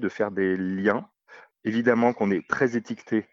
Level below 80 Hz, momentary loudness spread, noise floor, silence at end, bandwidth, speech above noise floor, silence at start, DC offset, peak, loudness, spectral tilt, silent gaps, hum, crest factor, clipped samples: -70 dBFS; 8 LU; -52 dBFS; 0.1 s; 7.4 kHz; 28 dB; 0 s; under 0.1%; -8 dBFS; -25 LUFS; -7 dB/octave; none; none; 18 dB; under 0.1%